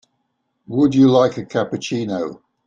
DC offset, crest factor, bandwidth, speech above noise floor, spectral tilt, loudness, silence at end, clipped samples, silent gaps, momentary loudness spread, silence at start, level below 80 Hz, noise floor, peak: under 0.1%; 16 dB; 7.6 kHz; 54 dB; -6.5 dB/octave; -18 LUFS; 0.3 s; under 0.1%; none; 13 LU; 0.7 s; -58 dBFS; -71 dBFS; -2 dBFS